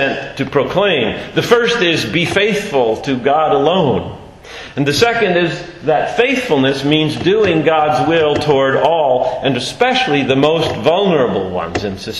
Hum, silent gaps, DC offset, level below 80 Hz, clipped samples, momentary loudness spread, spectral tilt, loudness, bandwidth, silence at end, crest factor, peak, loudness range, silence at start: none; none; under 0.1%; -44 dBFS; under 0.1%; 7 LU; -5 dB/octave; -14 LUFS; 13 kHz; 0 s; 14 dB; 0 dBFS; 2 LU; 0 s